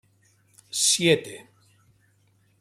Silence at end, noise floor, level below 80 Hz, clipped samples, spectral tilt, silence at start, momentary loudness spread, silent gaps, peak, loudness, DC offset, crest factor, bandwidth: 1.2 s; -64 dBFS; -68 dBFS; under 0.1%; -2.5 dB/octave; 0.75 s; 23 LU; none; -6 dBFS; -21 LUFS; under 0.1%; 22 dB; 15.5 kHz